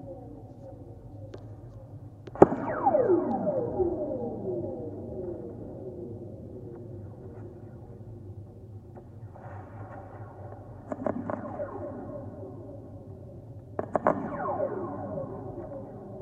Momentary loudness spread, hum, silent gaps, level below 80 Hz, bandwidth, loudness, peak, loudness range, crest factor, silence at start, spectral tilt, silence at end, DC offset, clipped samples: 20 LU; none; none; -56 dBFS; 7.6 kHz; -31 LUFS; 0 dBFS; 17 LU; 32 dB; 0 s; -10 dB/octave; 0 s; under 0.1%; under 0.1%